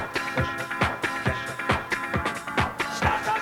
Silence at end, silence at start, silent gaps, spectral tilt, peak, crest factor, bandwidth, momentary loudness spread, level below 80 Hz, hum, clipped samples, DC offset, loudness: 0 s; 0 s; none; -4.5 dB/octave; -8 dBFS; 20 dB; 19 kHz; 3 LU; -44 dBFS; none; under 0.1%; under 0.1%; -26 LUFS